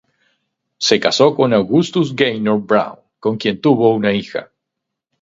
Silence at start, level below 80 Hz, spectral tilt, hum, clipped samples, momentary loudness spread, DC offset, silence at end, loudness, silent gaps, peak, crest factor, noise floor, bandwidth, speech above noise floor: 0.8 s; -58 dBFS; -5 dB/octave; none; under 0.1%; 9 LU; under 0.1%; 0.8 s; -15 LUFS; none; 0 dBFS; 16 dB; -79 dBFS; 7.8 kHz; 64 dB